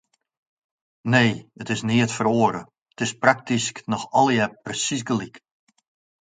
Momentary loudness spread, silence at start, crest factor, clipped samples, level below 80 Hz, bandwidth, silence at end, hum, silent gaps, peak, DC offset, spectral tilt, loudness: 10 LU; 1.05 s; 24 dB; under 0.1%; -62 dBFS; 9.6 kHz; 0.85 s; none; 2.82-2.86 s; 0 dBFS; under 0.1%; -4.5 dB/octave; -22 LUFS